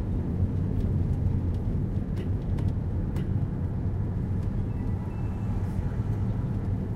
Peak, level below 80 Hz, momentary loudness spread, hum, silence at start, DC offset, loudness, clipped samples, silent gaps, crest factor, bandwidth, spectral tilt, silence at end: -14 dBFS; -34 dBFS; 3 LU; none; 0 s; under 0.1%; -30 LUFS; under 0.1%; none; 12 dB; 5.4 kHz; -10 dB/octave; 0 s